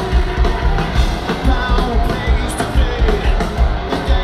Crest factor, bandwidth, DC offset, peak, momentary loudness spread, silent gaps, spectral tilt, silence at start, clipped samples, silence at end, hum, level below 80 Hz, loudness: 14 dB; 12.5 kHz; under 0.1%; -2 dBFS; 2 LU; none; -6 dB/octave; 0 s; under 0.1%; 0 s; none; -16 dBFS; -17 LUFS